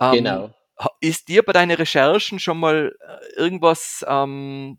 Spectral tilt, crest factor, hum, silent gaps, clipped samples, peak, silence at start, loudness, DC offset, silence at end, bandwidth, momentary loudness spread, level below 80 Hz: -4 dB/octave; 18 dB; none; none; under 0.1%; 0 dBFS; 0 s; -19 LUFS; under 0.1%; 0.05 s; 18 kHz; 12 LU; -68 dBFS